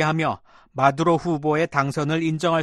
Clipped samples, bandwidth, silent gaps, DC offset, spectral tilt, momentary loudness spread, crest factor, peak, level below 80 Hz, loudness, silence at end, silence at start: under 0.1%; 12 kHz; none; under 0.1%; -6.5 dB/octave; 6 LU; 18 dB; -4 dBFS; -56 dBFS; -22 LUFS; 0 s; 0 s